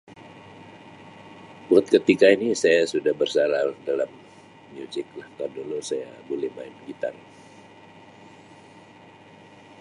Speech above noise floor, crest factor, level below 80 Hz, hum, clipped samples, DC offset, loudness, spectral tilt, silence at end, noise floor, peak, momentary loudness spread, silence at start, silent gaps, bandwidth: 26 dB; 22 dB; -70 dBFS; none; under 0.1%; under 0.1%; -23 LUFS; -4.5 dB/octave; 2.7 s; -49 dBFS; -2 dBFS; 27 LU; 0.2 s; none; 11.5 kHz